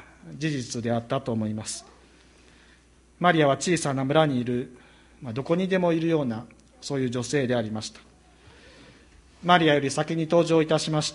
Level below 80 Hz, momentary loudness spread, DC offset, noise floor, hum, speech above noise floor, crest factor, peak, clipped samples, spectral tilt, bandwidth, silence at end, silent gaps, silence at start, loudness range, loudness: -58 dBFS; 14 LU; under 0.1%; -57 dBFS; none; 32 dB; 22 dB; -4 dBFS; under 0.1%; -5 dB/octave; 11.5 kHz; 0 s; none; 0 s; 5 LU; -25 LUFS